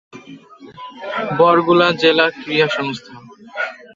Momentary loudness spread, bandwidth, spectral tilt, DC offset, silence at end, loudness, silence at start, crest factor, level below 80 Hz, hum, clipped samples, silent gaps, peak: 20 LU; 7.6 kHz; -5.5 dB/octave; under 0.1%; 0.2 s; -16 LUFS; 0.15 s; 18 dB; -62 dBFS; none; under 0.1%; none; 0 dBFS